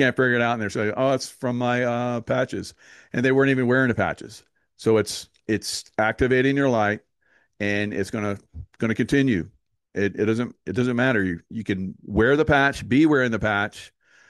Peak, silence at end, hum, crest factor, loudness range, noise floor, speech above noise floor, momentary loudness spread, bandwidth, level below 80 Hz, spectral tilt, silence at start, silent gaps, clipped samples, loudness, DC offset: -6 dBFS; 0.45 s; none; 18 dB; 4 LU; -65 dBFS; 42 dB; 11 LU; 12.5 kHz; -48 dBFS; -6 dB/octave; 0 s; none; under 0.1%; -23 LUFS; under 0.1%